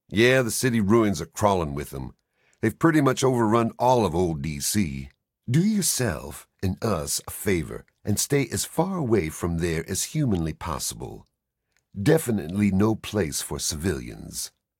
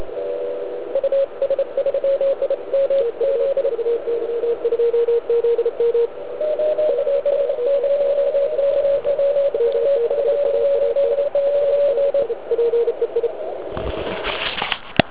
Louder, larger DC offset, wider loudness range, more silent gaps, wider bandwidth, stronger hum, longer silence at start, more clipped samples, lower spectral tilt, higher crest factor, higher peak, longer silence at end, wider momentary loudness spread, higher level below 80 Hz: second, -24 LUFS vs -20 LUFS; second, under 0.1% vs 1%; about the same, 4 LU vs 2 LU; neither; first, 17 kHz vs 4 kHz; neither; about the same, 0.1 s vs 0 s; neither; second, -5 dB/octave vs -8.5 dB/octave; about the same, 20 dB vs 20 dB; second, -6 dBFS vs 0 dBFS; first, 0.3 s vs 0 s; first, 12 LU vs 7 LU; about the same, -46 dBFS vs -48 dBFS